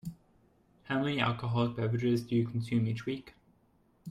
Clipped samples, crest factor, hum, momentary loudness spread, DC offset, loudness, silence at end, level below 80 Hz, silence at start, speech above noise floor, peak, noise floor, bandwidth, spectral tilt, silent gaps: under 0.1%; 18 dB; none; 10 LU; under 0.1%; -32 LUFS; 0 s; -64 dBFS; 0.05 s; 37 dB; -14 dBFS; -68 dBFS; 12 kHz; -7.5 dB/octave; none